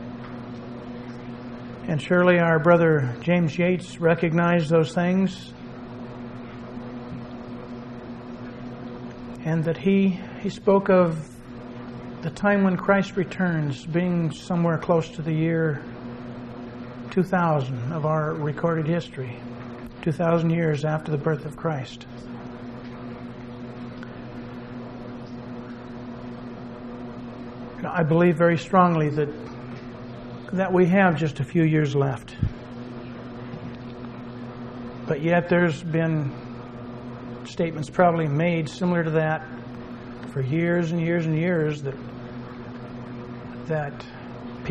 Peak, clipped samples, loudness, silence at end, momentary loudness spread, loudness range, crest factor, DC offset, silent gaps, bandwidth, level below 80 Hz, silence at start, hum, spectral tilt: -4 dBFS; under 0.1%; -23 LUFS; 0 s; 18 LU; 15 LU; 22 dB; under 0.1%; none; 9.2 kHz; -50 dBFS; 0 s; none; -8 dB/octave